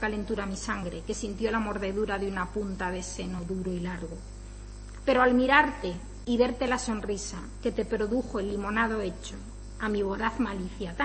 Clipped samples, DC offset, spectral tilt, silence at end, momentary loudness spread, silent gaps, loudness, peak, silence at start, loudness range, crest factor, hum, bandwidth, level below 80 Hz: under 0.1%; under 0.1%; -5 dB/octave; 0 s; 16 LU; none; -29 LUFS; -6 dBFS; 0 s; 5 LU; 22 dB; 50 Hz at -45 dBFS; 8.8 kHz; -42 dBFS